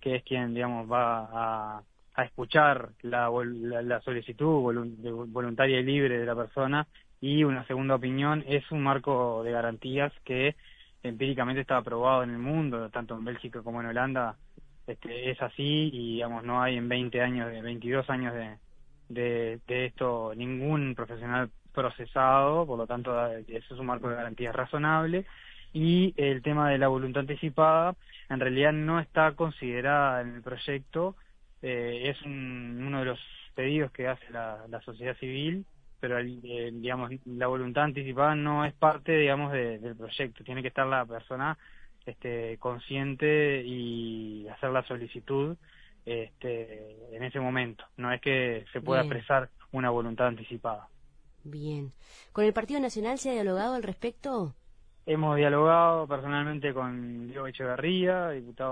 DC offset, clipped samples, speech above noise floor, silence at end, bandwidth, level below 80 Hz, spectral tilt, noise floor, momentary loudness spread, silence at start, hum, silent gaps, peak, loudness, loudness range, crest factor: under 0.1%; under 0.1%; 26 dB; 0 s; 10 kHz; -56 dBFS; -7 dB/octave; -56 dBFS; 13 LU; 0 s; none; none; -8 dBFS; -30 LUFS; 7 LU; 22 dB